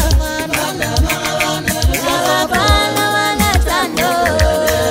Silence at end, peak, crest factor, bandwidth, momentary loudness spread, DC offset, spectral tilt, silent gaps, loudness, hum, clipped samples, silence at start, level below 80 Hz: 0 s; 0 dBFS; 14 dB; 16.5 kHz; 4 LU; under 0.1%; -3.5 dB/octave; none; -14 LUFS; none; under 0.1%; 0 s; -22 dBFS